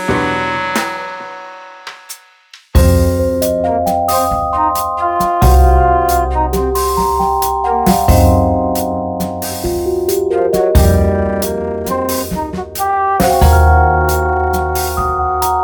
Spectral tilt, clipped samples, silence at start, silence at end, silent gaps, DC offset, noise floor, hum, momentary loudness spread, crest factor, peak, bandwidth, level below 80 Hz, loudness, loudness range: -6 dB/octave; under 0.1%; 0 s; 0 s; none; under 0.1%; -43 dBFS; none; 11 LU; 14 dB; 0 dBFS; over 20 kHz; -20 dBFS; -14 LUFS; 3 LU